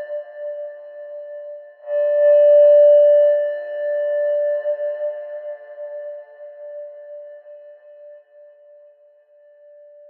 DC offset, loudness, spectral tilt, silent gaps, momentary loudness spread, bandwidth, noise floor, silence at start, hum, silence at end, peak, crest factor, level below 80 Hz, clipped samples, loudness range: under 0.1%; -16 LUFS; -3.5 dB/octave; none; 26 LU; 3.1 kHz; -52 dBFS; 0 s; none; 1.95 s; -6 dBFS; 14 dB; under -90 dBFS; under 0.1%; 21 LU